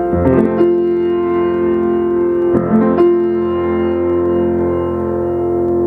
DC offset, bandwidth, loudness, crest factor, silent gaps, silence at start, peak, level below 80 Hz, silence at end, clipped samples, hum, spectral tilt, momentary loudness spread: under 0.1%; 3 kHz; -14 LUFS; 14 dB; none; 0 s; 0 dBFS; -38 dBFS; 0 s; under 0.1%; none; -10.5 dB/octave; 4 LU